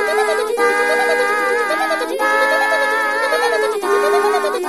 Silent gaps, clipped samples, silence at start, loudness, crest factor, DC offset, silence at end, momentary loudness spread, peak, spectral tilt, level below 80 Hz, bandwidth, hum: none; under 0.1%; 0 s; -16 LUFS; 14 dB; 0.3%; 0 s; 3 LU; -4 dBFS; -1 dB/octave; -60 dBFS; 13.5 kHz; none